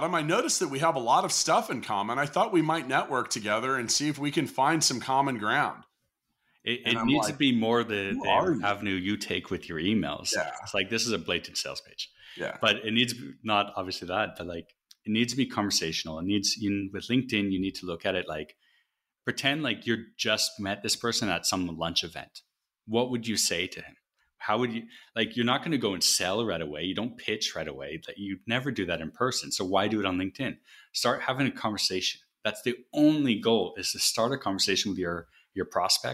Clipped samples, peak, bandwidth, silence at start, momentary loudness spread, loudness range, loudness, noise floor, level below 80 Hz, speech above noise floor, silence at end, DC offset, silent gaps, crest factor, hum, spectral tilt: under 0.1%; -10 dBFS; 16 kHz; 0 s; 11 LU; 4 LU; -28 LUFS; -79 dBFS; -62 dBFS; 51 dB; 0 s; under 0.1%; none; 20 dB; none; -3 dB/octave